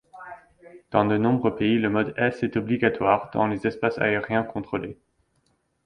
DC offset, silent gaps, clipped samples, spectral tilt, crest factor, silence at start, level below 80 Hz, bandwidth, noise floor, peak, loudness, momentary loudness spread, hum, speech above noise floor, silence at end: under 0.1%; none; under 0.1%; -8 dB/octave; 22 dB; 0.15 s; -56 dBFS; 9.4 kHz; -69 dBFS; -4 dBFS; -24 LUFS; 10 LU; none; 46 dB; 0.9 s